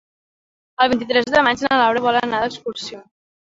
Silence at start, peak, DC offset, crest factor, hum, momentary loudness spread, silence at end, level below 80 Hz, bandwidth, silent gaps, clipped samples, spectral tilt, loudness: 0.8 s; -2 dBFS; under 0.1%; 18 dB; none; 14 LU; 0.5 s; -56 dBFS; 8 kHz; none; under 0.1%; -4 dB/octave; -18 LUFS